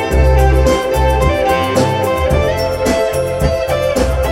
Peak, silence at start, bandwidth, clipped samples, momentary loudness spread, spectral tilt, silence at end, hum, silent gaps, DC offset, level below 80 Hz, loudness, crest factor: 0 dBFS; 0 s; 16.5 kHz; under 0.1%; 4 LU; -6 dB/octave; 0 s; none; none; under 0.1%; -18 dBFS; -14 LUFS; 12 dB